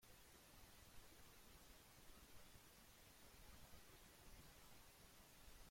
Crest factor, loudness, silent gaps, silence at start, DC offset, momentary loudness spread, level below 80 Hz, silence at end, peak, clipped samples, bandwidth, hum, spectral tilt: 16 dB; -66 LUFS; none; 0 s; under 0.1%; 1 LU; -72 dBFS; 0 s; -50 dBFS; under 0.1%; 16.5 kHz; none; -3 dB/octave